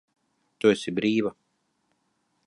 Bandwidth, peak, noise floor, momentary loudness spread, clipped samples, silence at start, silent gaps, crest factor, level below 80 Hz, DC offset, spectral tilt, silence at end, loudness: 11.5 kHz; -6 dBFS; -74 dBFS; 5 LU; under 0.1%; 0.65 s; none; 22 dB; -68 dBFS; under 0.1%; -5.5 dB/octave; 1.15 s; -25 LUFS